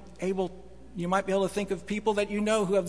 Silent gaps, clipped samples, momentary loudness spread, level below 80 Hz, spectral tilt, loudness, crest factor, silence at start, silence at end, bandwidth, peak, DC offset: none; under 0.1%; 8 LU; -54 dBFS; -5.5 dB/octave; -29 LUFS; 16 dB; 0 s; 0 s; 11 kHz; -12 dBFS; 0.4%